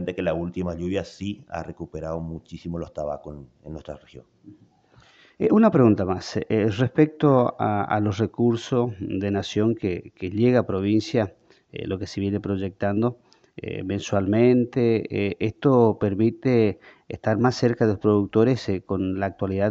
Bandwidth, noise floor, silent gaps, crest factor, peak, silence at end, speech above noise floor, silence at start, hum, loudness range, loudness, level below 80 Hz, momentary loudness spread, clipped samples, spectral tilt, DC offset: 7.8 kHz; -56 dBFS; none; 18 dB; -4 dBFS; 0 s; 33 dB; 0 s; none; 11 LU; -23 LUFS; -54 dBFS; 16 LU; under 0.1%; -7.5 dB/octave; under 0.1%